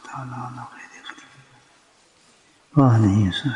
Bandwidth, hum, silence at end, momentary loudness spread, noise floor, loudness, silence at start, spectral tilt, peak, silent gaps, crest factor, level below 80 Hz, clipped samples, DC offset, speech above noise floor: 10 kHz; none; 0 s; 23 LU; -57 dBFS; -19 LUFS; 0.05 s; -7.5 dB/octave; -4 dBFS; none; 20 dB; -58 dBFS; under 0.1%; under 0.1%; 37 dB